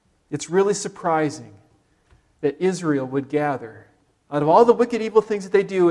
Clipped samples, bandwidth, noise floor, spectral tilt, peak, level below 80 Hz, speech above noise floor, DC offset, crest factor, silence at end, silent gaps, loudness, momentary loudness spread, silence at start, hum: under 0.1%; 11.5 kHz; -60 dBFS; -6 dB/octave; -2 dBFS; -64 dBFS; 40 dB; under 0.1%; 20 dB; 0 s; none; -21 LUFS; 14 LU; 0.3 s; none